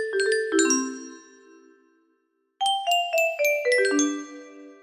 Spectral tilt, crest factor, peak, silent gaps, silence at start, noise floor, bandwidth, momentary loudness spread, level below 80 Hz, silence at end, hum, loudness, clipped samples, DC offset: 0 dB/octave; 18 dB; -8 dBFS; none; 0 s; -71 dBFS; 15.5 kHz; 18 LU; -76 dBFS; 0.1 s; none; -23 LUFS; under 0.1%; under 0.1%